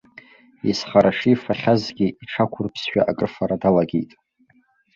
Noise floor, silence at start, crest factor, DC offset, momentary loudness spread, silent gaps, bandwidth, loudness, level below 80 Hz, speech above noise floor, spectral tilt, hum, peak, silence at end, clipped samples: -60 dBFS; 0.65 s; 20 dB; under 0.1%; 8 LU; none; 7.6 kHz; -21 LUFS; -54 dBFS; 40 dB; -6.5 dB/octave; none; -2 dBFS; 0.9 s; under 0.1%